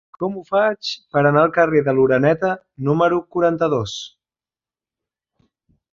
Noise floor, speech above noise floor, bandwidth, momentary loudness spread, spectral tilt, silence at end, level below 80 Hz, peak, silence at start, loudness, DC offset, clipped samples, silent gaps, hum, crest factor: under -90 dBFS; over 72 dB; 7.6 kHz; 11 LU; -6.5 dB/octave; 1.85 s; -56 dBFS; -2 dBFS; 0.2 s; -18 LUFS; under 0.1%; under 0.1%; none; none; 18 dB